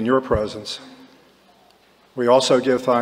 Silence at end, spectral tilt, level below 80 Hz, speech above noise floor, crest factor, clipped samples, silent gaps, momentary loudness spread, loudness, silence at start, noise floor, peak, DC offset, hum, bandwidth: 0 s; -4.5 dB/octave; -46 dBFS; 36 dB; 18 dB; under 0.1%; none; 17 LU; -19 LUFS; 0 s; -55 dBFS; -2 dBFS; under 0.1%; none; 15 kHz